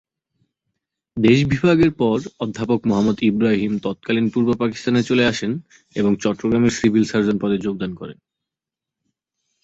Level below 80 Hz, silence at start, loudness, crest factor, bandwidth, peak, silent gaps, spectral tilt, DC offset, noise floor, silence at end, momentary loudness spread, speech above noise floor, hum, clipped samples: -50 dBFS; 1.15 s; -19 LUFS; 18 dB; 8 kHz; -2 dBFS; none; -6.5 dB/octave; under 0.1%; -86 dBFS; 1.5 s; 11 LU; 68 dB; none; under 0.1%